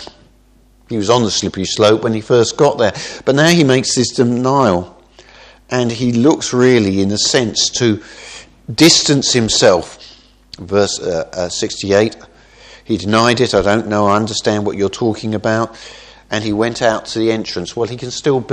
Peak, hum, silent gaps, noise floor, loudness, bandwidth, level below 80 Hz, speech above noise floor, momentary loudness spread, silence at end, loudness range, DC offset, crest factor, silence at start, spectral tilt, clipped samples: 0 dBFS; none; none; -49 dBFS; -14 LUFS; 14 kHz; -46 dBFS; 35 dB; 10 LU; 0 s; 5 LU; under 0.1%; 14 dB; 0 s; -4 dB/octave; under 0.1%